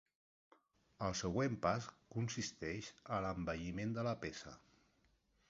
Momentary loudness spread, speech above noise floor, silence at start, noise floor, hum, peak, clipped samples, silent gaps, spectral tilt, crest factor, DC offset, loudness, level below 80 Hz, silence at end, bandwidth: 10 LU; 35 dB; 1 s; -77 dBFS; none; -20 dBFS; under 0.1%; none; -5 dB/octave; 22 dB; under 0.1%; -42 LUFS; -62 dBFS; 0.9 s; 7.6 kHz